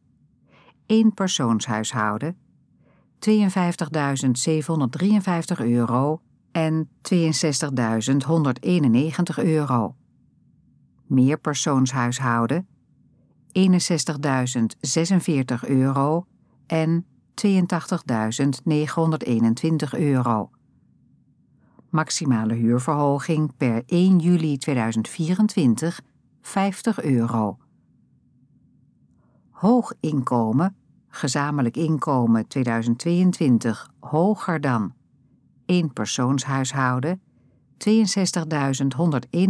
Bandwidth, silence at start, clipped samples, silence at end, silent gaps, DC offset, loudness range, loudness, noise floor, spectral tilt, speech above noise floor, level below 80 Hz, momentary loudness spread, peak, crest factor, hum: 11 kHz; 0.9 s; under 0.1%; 0 s; none; under 0.1%; 3 LU; -22 LUFS; -60 dBFS; -6 dB/octave; 39 dB; -70 dBFS; 7 LU; -6 dBFS; 16 dB; none